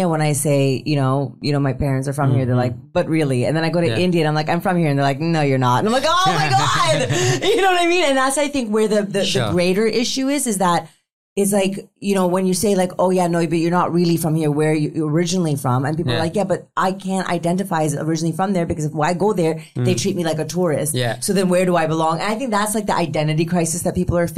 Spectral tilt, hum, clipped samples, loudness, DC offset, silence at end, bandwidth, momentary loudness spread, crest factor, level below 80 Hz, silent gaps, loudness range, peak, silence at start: -5 dB/octave; none; under 0.1%; -18 LUFS; 0.7%; 0 s; 15.5 kHz; 5 LU; 12 dB; -46 dBFS; 11.13-11.36 s; 4 LU; -6 dBFS; 0 s